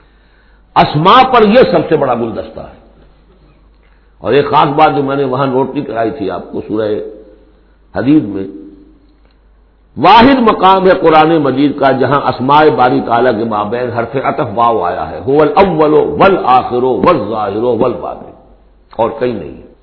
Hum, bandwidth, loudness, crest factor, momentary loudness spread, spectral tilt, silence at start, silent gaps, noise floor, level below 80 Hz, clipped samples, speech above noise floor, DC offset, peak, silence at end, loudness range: none; 5.4 kHz; -10 LUFS; 12 dB; 14 LU; -8.5 dB/octave; 0.75 s; none; -46 dBFS; -40 dBFS; 0.7%; 36 dB; under 0.1%; 0 dBFS; 0.2 s; 8 LU